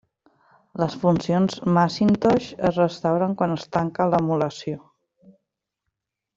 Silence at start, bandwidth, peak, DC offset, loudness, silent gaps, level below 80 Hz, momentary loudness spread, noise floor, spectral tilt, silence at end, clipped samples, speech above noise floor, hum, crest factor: 0.75 s; 7.6 kHz; -6 dBFS; under 0.1%; -22 LUFS; none; -56 dBFS; 8 LU; -81 dBFS; -7.5 dB/octave; 1.6 s; under 0.1%; 60 dB; none; 18 dB